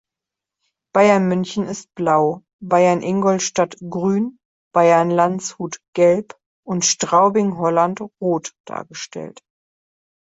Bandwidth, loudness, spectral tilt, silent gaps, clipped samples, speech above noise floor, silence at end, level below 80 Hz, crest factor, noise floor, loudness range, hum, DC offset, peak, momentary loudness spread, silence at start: 8 kHz; -18 LUFS; -4.5 dB/octave; 2.53-2.59 s, 4.45-4.71 s, 5.88-5.93 s, 6.46-6.63 s, 8.60-8.64 s; under 0.1%; 68 dB; 0.95 s; -62 dBFS; 16 dB; -86 dBFS; 2 LU; none; under 0.1%; -2 dBFS; 16 LU; 0.95 s